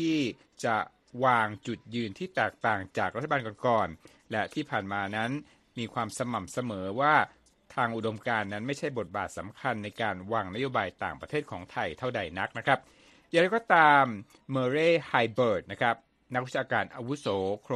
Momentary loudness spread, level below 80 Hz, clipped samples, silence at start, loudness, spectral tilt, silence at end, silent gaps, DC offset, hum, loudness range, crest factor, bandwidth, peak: 11 LU; -66 dBFS; under 0.1%; 0 s; -29 LUFS; -5.5 dB/octave; 0 s; none; under 0.1%; none; 7 LU; 24 dB; 13 kHz; -6 dBFS